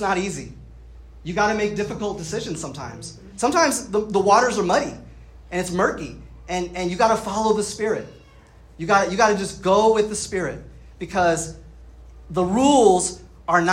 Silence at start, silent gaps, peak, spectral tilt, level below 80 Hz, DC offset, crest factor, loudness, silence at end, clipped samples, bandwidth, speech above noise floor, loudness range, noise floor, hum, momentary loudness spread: 0 s; none; -4 dBFS; -4 dB/octave; -46 dBFS; under 0.1%; 18 dB; -21 LUFS; 0 s; under 0.1%; 15.5 kHz; 27 dB; 3 LU; -48 dBFS; none; 17 LU